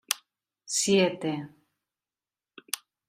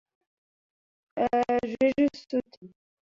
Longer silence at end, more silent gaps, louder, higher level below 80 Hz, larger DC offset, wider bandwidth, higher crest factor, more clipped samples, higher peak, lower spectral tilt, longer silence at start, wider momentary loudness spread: about the same, 0.3 s vs 0.4 s; second, none vs 2.57-2.61 s; about the same, -28 LUFS vs -27 LUFS; second, -72 dBFS vs -62 dBFS; neither; first, 16 kHz vs 7.4 kHz; first, 26 dB vs 16 dB; neither; first, -4 dBFS vs -14 dBFS; second, -3 dB/octave vs -6.5 dB/octave; second, 0.1 s vs 1.15 s; first, 14 LU vs 8 LU